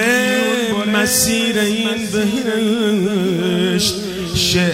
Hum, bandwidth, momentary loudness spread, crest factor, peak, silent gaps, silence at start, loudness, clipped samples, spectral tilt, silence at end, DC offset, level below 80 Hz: none; 16 kHz; 5 LU; 14 dB; -2 dBFS; none; 0 s; -16 LUFS; under 0.1%; -3.5 dB/octave; 0 s; under 0.1%; -44 dBFS